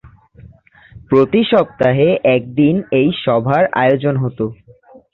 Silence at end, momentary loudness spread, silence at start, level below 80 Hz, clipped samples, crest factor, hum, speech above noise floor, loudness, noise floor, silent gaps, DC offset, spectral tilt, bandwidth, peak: 0.6 s; 6 LU; 0.95 s; -50 dBFS; under 0.1%; 14 dB; none; 31 dB; -15 LUFS; -44 dBFS; none; under 0.1%; -9.5 dB/octave; 5.4 kHz; -2 dBFS